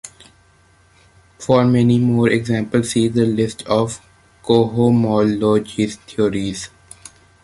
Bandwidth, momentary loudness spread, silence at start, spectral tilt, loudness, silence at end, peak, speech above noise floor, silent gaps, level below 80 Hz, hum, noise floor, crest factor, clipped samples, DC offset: 11.5 kHz; 14 LU; 0.05 s; -6.5 dB/octave; -17 LUFS; 0.75 s; -2 dBFS; 37 dB; none; -48 dBFS; none; -53 dBFS; 16 dB; under 0.1%; under 0.1%